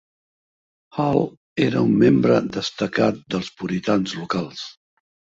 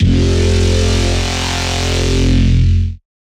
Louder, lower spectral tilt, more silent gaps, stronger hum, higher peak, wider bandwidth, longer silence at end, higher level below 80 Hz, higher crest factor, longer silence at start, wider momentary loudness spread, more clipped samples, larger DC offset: second, -21 LUFS vs -14 LUFS; about the same, -6.5 dB/octave vs -5.5 dB/octave; first, 1.37-1.56 s vs none; neither; about the same, -4 dBFS vs -2 dBFS; second, 7.8 kHz vs 12.5 kHz; first, 0.65 s vs 0.4 s; second, -56 dBFS vs -18 dBFS; first, 18 dB vs 10 dB; first, 0.95 s vs 0 s; first, 12 LU vs 4 LU; neither; neither